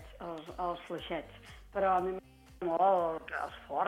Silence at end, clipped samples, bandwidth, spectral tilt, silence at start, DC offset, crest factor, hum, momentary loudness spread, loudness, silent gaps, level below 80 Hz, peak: 0 s; under 0.1%; 15 kHz; -6 dB/octave; 0 s; under 0.1%; 18 dB; none; 16 LU; -34 LUFS; none; -58 dBFS; -16 dBFS